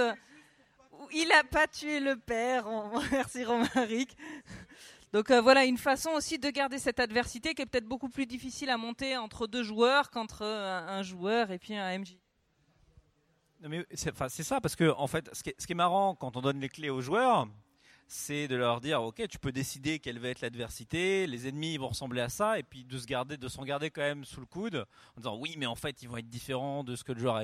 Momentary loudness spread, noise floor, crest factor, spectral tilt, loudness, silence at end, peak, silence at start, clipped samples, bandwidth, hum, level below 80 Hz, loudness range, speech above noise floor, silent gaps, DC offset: 14 LU; -72 dBFS; 24 dB; -4 dB/octave; -32 LUFS; 0 s; -10 dBFS; 0 s; under 0.1%; 16 kHz; none; -60 dBFS; 9 LU; 40 dB; none; under 0.1%